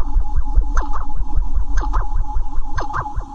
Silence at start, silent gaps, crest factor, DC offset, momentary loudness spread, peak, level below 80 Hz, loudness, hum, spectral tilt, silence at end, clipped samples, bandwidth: 0 s; none; 12 dB; under 0.1%; 5 LU; 0 dBFS; -18 dBFS; -25 LUFS; none; -6.5 dB/octave; 0 s; under 0.1%; 6.6 kHz